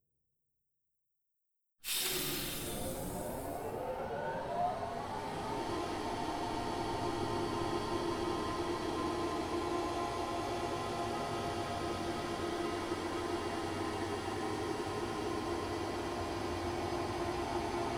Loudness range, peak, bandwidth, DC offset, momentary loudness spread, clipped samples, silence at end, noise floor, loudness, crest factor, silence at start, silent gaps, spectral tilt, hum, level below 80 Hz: 2 LU; -22 dBFS; over 20 kHz; under 0.1%; 3 LU; under 0.1%; 0 s; -80 dBFS; -37 LUFS; 14 dB; 1.85 s; none; -4.5 dB/octave; none; -56 dBFS